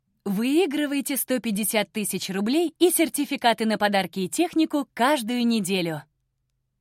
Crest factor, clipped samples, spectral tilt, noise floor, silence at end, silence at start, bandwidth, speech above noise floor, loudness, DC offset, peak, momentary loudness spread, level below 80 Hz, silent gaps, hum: 18 dB; under 0.1%; -3.5 dB/octave; -75 dBFS; 0.8 s; 0.25 s; 16.5 kHz; 52 dB; -24 LUFS; under 0.1%; -6 dBFS; 6 LU; -70 dBFS; none; none